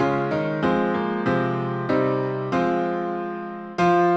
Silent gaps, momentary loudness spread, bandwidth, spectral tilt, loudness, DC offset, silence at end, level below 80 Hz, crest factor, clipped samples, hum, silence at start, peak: none; 7 LU; 8 kHz; -7.5 dB/octave; -23 LUFS; under 0.1%; 0 s; -56 dBFS; 14 dB; under 0.1%; none; 0 s; -8 dBFS